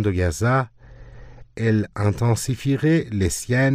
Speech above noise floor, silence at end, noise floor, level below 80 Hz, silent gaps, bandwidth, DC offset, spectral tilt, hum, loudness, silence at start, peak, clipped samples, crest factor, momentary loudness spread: 21 dB; 0 s; -42 dBFS; -44 dBFS; none; 16 kHz; under 0.1%; -6 dB/octave; none; -21 LUFS; 0 s; -6 dBFS; under 0.1%; 14 dB; 4 LU